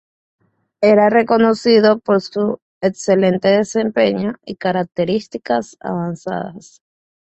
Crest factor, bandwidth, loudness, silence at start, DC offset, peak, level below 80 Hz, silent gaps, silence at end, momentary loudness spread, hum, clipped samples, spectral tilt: 16 dB; 8.4 kHz; -16 LUFS; 0.8 s; under 0.1%; -2 dBFS; -58 dBFS; 2.62-2.81 s; 0.8 s; 11 LU; none; under 0.1%; -6 dB/octave